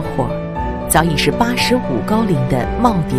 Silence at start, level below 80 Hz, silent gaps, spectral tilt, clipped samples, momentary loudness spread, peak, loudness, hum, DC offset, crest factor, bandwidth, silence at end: 0 s; -30 dBFS; none; -5 dB/octave; under 0.1%; 7 LU; 0 dBFS; -16 LUFS; none; under 0.1%; 16 dB; 16 kHz; 0 s